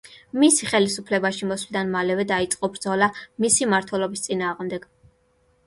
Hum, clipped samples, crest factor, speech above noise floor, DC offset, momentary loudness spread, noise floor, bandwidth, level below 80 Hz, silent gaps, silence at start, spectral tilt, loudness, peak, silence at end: none; under 0.1%; 18 dB; 41 dB; under 0.1%; 9 LU; -63 dBFS; 11.5 kHz; -60 dBFS; none; 0.05 s; -3 dB/octave; -22 LUFS; -4 dBFS; 0.85 s